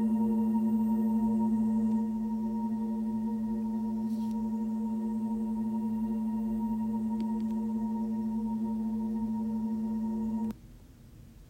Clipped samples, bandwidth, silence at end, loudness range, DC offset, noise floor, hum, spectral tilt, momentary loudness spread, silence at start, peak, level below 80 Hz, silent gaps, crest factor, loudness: under 0.1%; 8.8 kHz; 0 s; 3 LU; under 0.1%; -52 dBFS; none; -9 dB/octave; 5 LU; 0 s; -20 dBFS; -56 dBFS; none; 10 dB; -32 LUFS